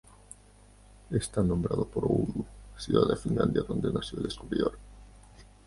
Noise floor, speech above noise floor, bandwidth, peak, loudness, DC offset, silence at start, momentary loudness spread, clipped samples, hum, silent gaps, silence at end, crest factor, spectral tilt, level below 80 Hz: -56 dBFS; 27 dB; 11.5 kHz; -10 dBFS; -30 LUFS; under 0.1%; 1.1 s; 18 LU; under 0.1%; 50 Hz at -45 dBFS; none; 0.2 s; 22 dB; -6.5 dB/octave; -48 dBFS